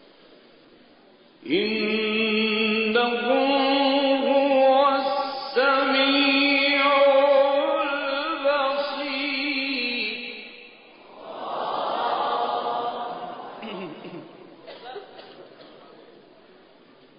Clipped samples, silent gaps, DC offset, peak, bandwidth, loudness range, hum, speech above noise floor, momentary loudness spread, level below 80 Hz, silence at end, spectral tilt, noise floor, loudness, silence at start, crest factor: under 0.1%; none; under 0.1%; -8 dBFS; 5.4 kHz; 13 LU; none; 32 dB; 19 LU; -74 dBFS; 1.5 s; -8.5 dB/octave; -54 dBFS; -22 LUFS; 1.45 s; 16 dB